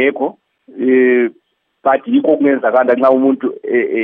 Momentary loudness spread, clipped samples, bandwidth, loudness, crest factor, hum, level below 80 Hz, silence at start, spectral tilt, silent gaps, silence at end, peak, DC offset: 9 LU; under 0.1%; 3.8 kHz; -14 LUFS; 14 dB; none; -72 dBFS; 0 s; -8.5 dB/octave; none; 0 s; 0 dBFS; under 0.1%